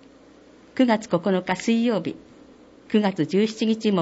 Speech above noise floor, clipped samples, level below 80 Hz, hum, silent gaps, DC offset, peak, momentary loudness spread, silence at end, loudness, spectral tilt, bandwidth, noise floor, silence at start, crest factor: 29 dB; under 0.1%; -64 dBFS; none; none; under 0.1%; -8 dBFS; 8 LU; 0 s; -23 LUFS; -6 dB/octave; 8 kHz; -50 dBFS; 0.75 s; 16 dB